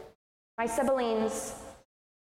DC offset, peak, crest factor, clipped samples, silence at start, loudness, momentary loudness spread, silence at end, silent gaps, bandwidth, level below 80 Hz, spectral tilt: under 0.1%; -16 dBFS; 16 dB; under 0.1%; 0 s; -31 LUFS; 18 LU; 0.55 s; 0.15-0.58 s; 16 kHz; -60 dBFS; -3.5 dB/octave